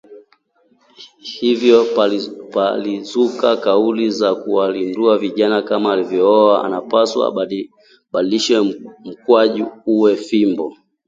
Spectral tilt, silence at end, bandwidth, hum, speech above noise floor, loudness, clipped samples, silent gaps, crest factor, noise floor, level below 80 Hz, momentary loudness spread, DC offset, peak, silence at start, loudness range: -5 dB/octave; 0.35 s; 7.8 kHz; none; 43 dB; -16 LUFS; under 0.1%; none; 16 dB; -58 dBFS; -64 dBFS; 11 LU; under 0.1%; 0 dBFS; 0.1 s; 2 LU